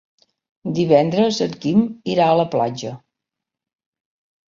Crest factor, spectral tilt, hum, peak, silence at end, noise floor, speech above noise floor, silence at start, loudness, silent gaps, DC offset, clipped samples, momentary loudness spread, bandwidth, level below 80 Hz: 20 dB; -6.5 dB/octave; none; -2 dBFS; 1.55 s; -85 dBFS; 67 dB; 0.65 s; -18 LUFS; none; under 0.1%; under 0.1%; 13 LU; 7.6 kHz; -60 dBFS